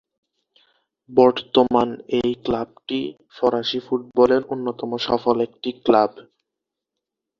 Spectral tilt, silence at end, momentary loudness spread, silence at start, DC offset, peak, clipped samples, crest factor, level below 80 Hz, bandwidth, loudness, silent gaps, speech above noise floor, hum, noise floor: -6.5 dB/octave; 1.2 s; 10 LU; 1.1 s; under 0.1%; -2 dBFS; under 0.1%; 20 dB; -56 dBFS; 7 kHz; -21 LUFS; none; 64 dB; none; -84 dBFS